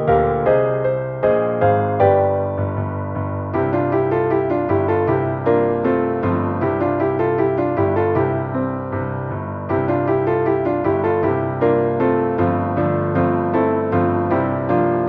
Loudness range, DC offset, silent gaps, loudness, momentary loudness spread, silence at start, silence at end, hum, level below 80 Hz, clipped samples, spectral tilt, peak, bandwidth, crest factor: 2 LU; under 0.1%; none; -19 LUFS; 6 LU; 0 s; 0 s; none; -46 dBFS; under 0.1%; -11.5 dB/octave; -4 dBFS; 4.7 kHz; 14 dB